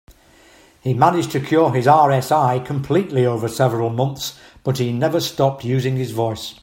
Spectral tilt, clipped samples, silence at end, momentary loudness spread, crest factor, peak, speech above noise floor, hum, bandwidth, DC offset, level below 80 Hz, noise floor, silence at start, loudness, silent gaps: -6.5 dB/octave; under 0.1%; 0.1 s; 10 LU; 18 dB; 0 dBFS; 32 dB; none; 16.5 kHz; under 0.1%; -54 dBFS; -50 dBFS; 0.85 s; -18 LUFS; none